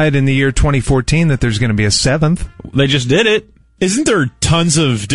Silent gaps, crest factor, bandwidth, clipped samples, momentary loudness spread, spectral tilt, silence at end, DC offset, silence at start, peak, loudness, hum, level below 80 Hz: none; 12 dB; 11.5 kHz; under 0.1%; 5 LU; -4.5 dB/octave; 0 s; 1%; 0 s; -2 dBFS; -14 LUFS; none; -26 dBFS